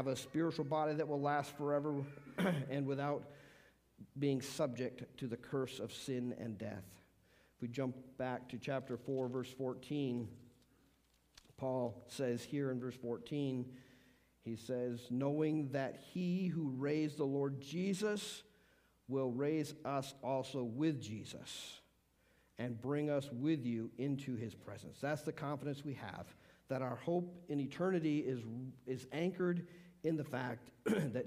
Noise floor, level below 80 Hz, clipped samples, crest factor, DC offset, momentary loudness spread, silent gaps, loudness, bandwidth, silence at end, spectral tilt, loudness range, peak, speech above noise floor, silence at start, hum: -74 dBFS; -76 dBFS; under 0.1%; 18 dB; under 0.1%; 11 LU; none; -41 LUFS; 15.5 kHz; 0 s; -6.5 dB/octave; 5 LU; -24 dBFS; 34 dB; 0 s; none